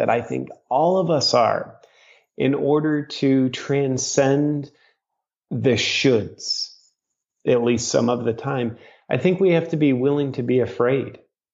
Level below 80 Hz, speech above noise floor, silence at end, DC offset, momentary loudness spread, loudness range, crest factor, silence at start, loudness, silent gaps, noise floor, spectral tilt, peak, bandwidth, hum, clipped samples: -62 dBFS; 63 dB; 0.35 s; under 0.1%; 10 LU; 2 LU; 16 dB; 0 s; -21 LUFS; none; -83 dBFS; -5 dB/octave; -4 dBFS; 8 kHz; none; under 0.1%